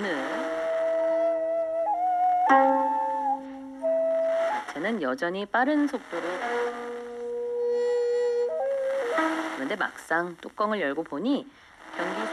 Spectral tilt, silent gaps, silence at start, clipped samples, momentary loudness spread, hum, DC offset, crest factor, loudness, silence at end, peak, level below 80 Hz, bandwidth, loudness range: -5 dB/octave; none; 0 s; under 0.1%; 9 LU; none; under 0.1%; 20 dB; -27 LUFS; 0 s; -8 dBFS; -70 dBFS; 12.5 kHz; 4 LU